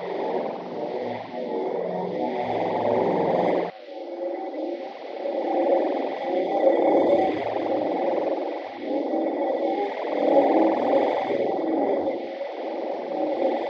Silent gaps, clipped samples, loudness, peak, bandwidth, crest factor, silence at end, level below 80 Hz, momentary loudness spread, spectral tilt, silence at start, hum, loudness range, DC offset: none; under 0.1%; -25 LUFS; -6 dBFS; 6.6 kHz; 18 dB; 0 s; -70 dBFS; 11 LU; -7.5 dB/octave; 0 s; none; 3 LU; under 0.1%